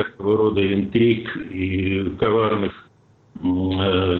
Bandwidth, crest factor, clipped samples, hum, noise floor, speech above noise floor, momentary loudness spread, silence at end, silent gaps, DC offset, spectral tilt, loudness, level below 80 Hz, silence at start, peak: 4.3 kHz; 12 dB; under 0.1%; none; -54 dBFS; 35 dB; 8 LU; 0 s; none; under 0.1%; -9.5 dB/octave; -21 LUFS; -48 dBFS; 0 s; -8 dBFS